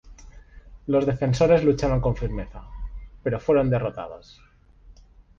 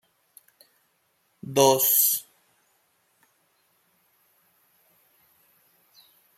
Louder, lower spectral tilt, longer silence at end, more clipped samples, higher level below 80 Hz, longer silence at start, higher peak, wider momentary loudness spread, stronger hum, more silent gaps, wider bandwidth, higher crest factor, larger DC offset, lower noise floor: second, -23 LUFS vs -20 LUFS; first, -7.5 dB/octave vs -2.5 dB/octave; second, 0.45 s vs 4.15 s; neither; first, -38 dBFS vs -74 dBFS; second, 0.05 s vs 1.45 s; about the same, -6 dBFS vs -4 dBFS; first, 21 LU vs 11 LU; neither; neither; second, 7.6 kHz vs 16.5 kHz; second, 18 dB vs 26 dB; neither; second, -51 dBFS vs -70 dBFS